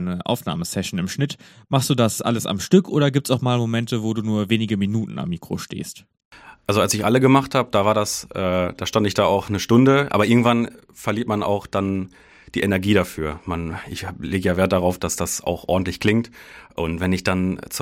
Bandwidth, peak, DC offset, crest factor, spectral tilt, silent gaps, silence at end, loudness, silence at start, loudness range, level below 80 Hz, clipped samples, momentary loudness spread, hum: 17 kHz; 0 dBFS; under 0.1%; 20 dB; -5.5 dB/octave; 6.25-6.31 s; 0 s; -21 LUFS; 0 s; 5 LU; -48 dBFS; under 0.1%; 12 LU; none